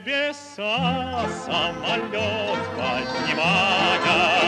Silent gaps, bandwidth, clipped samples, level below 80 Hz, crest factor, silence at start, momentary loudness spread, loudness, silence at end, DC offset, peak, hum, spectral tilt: none; 11.5 kHz; under 0.1%; -52 dBFS; 16 dB; 0 s; 8 LU; -22 LUFS; 0 s; under 0.1%; -6 dBFS; none; -4 dB/octave